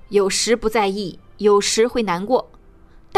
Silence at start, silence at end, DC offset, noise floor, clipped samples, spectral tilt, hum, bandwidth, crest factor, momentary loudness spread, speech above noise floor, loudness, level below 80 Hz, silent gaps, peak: 0.1 s; 0 s; under 0.1%; -46 dBFS; under 0.1%; -3 dB/octave; none; 14.5 kHz; 14 dB; 7 LU; 28 dB; -19 LUFS; -46 dBFS; none; -4 dBFS